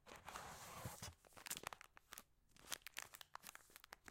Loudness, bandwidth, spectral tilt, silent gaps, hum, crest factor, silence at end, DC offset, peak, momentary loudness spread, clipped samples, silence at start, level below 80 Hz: -54 LUFS; 17 kHz; -1.5 dB/octave; none; none; 34 dB; 0 s; under 0.1%; -22 dBFS; 11 LU; under 0.1%; 0 s; -74 dBFS